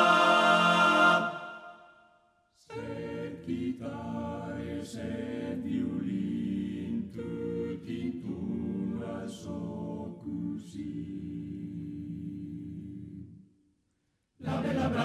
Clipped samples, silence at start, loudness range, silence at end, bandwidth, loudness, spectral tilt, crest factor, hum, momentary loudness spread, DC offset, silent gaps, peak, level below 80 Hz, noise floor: under 0.1%; 0 s; 11 LU; 0 s; 14 kHz; -31 LUFS; -5.5 dB/octave; 22 dB; none; 19 LU; under 0.1%; none; -10 dBFS; -56 dBFS; -77 dBFS